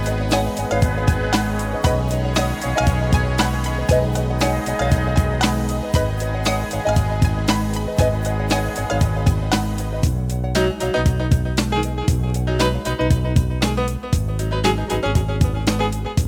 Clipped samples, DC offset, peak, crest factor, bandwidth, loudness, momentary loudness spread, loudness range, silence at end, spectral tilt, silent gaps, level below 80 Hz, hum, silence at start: under 0.1%; under 0.1%; -4 dBFS; 16 dB; 18.5 kHz; -20 LUFS; 3 LU; 1 LU; 0 s; -5.5 dB/octave; none; -26 dBFS; none; 0 s